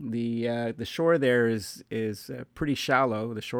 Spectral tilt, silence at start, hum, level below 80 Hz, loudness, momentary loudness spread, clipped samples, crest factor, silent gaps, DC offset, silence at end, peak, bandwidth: -5.5 dB/octave; 0 s; none; -58 dBFS; -27 LUFS; 10 LU; under 0.1%; 18 dB; none; under 0.1%; 0 s; -8 dBFS; 19 kHz